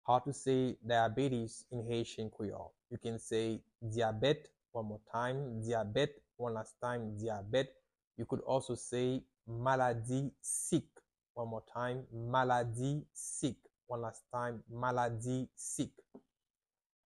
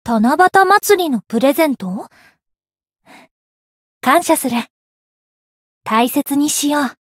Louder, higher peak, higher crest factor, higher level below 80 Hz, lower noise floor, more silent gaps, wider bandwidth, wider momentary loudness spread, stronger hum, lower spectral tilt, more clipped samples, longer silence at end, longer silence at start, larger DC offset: second, -38 LUFS vs -14 LUFS; second, -16 dBFS vs 0 dBFS; about the same, 20 dB vs 16 dB; second, -66 dBFS vs -60 dBFS; first, under -90 dBFS vs -80 dBFS; second, 8.07-8.11 s, 11.30-11.35 s vs 3.31-4.01 s, 4.70-5.81 s; second, 12 kHz vs 16.5 kHz; about the same, 10 LU vs 12 LU; neither; first, -5 dB/octave vs -3.5 dB/octave; neither; first, 0.95 s vs 0.15 s; about the same, 0.05 s vs 0.05 s; neither